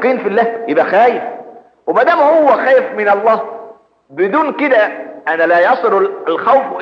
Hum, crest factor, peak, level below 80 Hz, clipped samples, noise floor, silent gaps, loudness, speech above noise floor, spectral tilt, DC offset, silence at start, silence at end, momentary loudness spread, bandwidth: none; 12 dB; 0 dBFS; -72 dBFS; under 0.1%; -37 dBFS; none; -12 LUFS; 25 dB; -6.5 dB/octave; under 0.1%; 0 s; 0 s; 13 LU; 6.6 kHz